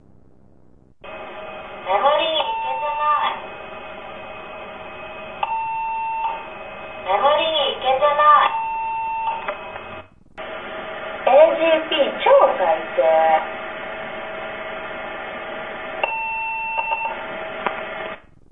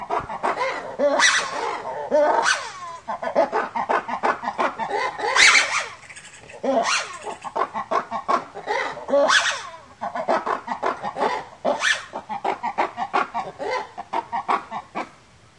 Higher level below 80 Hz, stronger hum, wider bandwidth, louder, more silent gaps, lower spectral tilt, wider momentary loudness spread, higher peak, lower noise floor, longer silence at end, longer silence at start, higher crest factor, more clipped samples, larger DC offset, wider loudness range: first, -54 dBFS vs -62 dBFS; neither; second, 4 kHz vs 11.5 kHz; about the same, -20 LUFS vs -22 LUFS; neither; first, -6 dB/octave vs -1 dB/octave; first, 20 LU vs 15 LU; about the same, -2 dBFS vs -2 dBFS; about the same, -53 dBFS vs -51 dBFS; second, 0 s vs 0.45 s; about the same, 0.05 s vs 0 s; about the same, 20 dB vs 22 dB; neither; first, 0.4% vs under 0.1%; first, 9 LU vs 6 LU